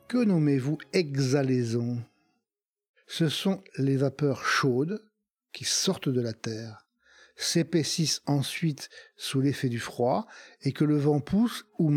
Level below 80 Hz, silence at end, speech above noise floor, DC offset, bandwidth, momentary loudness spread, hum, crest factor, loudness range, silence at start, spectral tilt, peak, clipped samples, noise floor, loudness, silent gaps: -66 dBFS; 0 s; over 63 dB; under 0.1%; 16.5 kHz; 11 LU; none; 18 dB; 2 LU; 0.1 s; -5 dB/octave; -10 dBFS; under 0.1%; under -90 dBFS; -28 LUFS; 2.65-2.73 s, 2.89-2.94 s